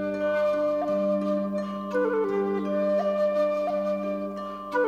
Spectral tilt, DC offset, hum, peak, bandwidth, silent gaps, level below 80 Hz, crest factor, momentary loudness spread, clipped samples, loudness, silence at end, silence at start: -7.5 dB/octave; under 0.1%; none; -14 dBFS; 7.6 kHz; none; -62 dBFS; 10 dB; 6 LU; under 0.1%; -26 LUFS; 0 s; 0 s